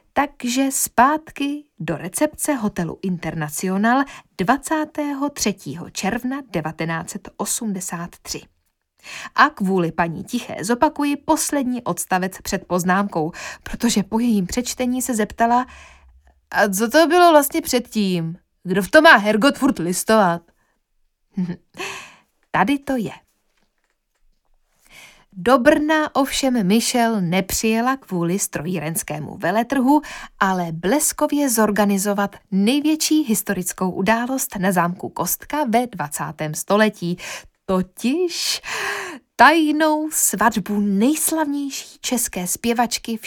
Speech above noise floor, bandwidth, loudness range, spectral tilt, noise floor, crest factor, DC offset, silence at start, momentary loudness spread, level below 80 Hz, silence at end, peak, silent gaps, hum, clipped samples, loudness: 50 dB; 19 kHz; 7 LU; -4 dB/octave; -69 dBFS; 20 dB; under 0.1%; 0.15 s; 11 LU; -50 dBFS; 0 s; 0 dBFS; none; none; under 0.1%; -19 LUFS